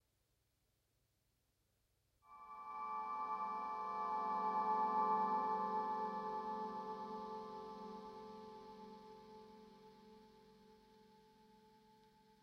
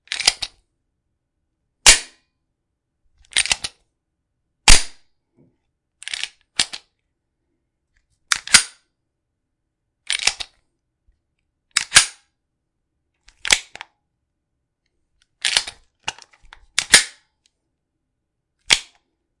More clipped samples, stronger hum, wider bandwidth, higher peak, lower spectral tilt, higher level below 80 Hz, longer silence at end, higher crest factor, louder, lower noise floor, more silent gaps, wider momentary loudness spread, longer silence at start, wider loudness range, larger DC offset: neither; neither; second, 6.8 kHz vs 12 kHz; second, -26 dBFS vs 0 dBFS; first, -6 dB/octave vs 1 dB/octave; second, -82 dBFS vs -34 dBFS; about the same, 0.65 s vs 0.6 s; about the same, 18 dB vs 22 dB; second, -42 LUFS vs -16 LUFS; first, -83 dBFS vs -77 dBFS; neither; first, 24 LU vs 19 LU; first, 2.25 s vs 0.1 s; first, 20 LU vs 7 LU; neither